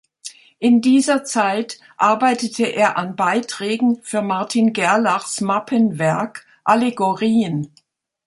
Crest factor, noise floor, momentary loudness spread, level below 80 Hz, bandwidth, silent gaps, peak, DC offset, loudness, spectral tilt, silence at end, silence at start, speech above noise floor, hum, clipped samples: 16 dB; -40 dBFS; 9 LU; -66 dBFS; 11.5 kHz; none; -2 dBFS; under 0.1%; -18 LUFS; -4.5 dB/octave; 0.6 s; 0.25 s; 22 dB; none; under 0.1%